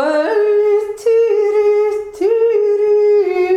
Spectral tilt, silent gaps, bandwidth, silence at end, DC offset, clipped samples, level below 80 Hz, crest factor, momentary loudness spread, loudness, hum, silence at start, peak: -4 dB/octave; none; 9.2 kHz; 0 s; under 0.1%; under 0.1%; -58 dBFS; 8 dB; 4 LU; -14 LUFS; none; 0 s; -6 dBFS